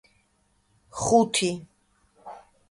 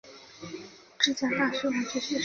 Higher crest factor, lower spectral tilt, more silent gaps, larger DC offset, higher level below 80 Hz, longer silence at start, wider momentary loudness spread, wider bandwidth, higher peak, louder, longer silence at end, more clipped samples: about the same, 22 dB vs 24 dB; about the same, -3.5 dB/octave vs -2.5 dB/octave; neither; neither; first, -58 dBFS vs -68 dBFS; first, 0.95 s vs 0.05 s; first, 25 LU vs 20 LU; first, 11.5 kHz vs 7.4 kHz; about the same, -6 dBFS vs -8 dBFS; first, -23 LUFS vs -27 LUFS; first, 0.3 s vs 0 s; neither